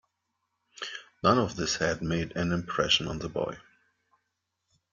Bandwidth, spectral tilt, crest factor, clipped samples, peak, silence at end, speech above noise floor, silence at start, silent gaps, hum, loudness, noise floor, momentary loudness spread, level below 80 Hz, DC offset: 7.6 kHz; -4 dB/octave; 22 dB; under 0.1%; -8 dBFS; 1.3 s; 53 dB; 0.75 s; none; none; -29 LUFS; -81 dBFS; 14 LU; -54 dBFS; under 0.1%